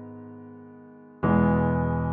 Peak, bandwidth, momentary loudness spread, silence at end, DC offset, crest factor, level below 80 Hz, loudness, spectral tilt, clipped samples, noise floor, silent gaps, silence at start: -10 dBFS; 3.6 kHz; 23 LU; 0 s; under 0.1%; 16 dB; -42 dBFS; -24 LUFS; -9.5 dB/octave; under 0.1%; -48 dBFS; none; 0 s